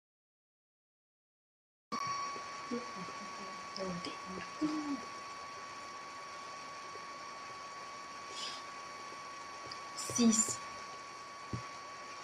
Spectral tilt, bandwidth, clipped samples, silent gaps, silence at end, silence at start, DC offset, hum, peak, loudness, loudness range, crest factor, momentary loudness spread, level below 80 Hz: -2.5 dB/octave; 13.5 kHz; under 0.1%; none; 0 s; 1.9 s; under 0.1%; none; -18 dBFS; -40 LUFS; 8 LU; 24 dB; 11 LU; -76 dBFS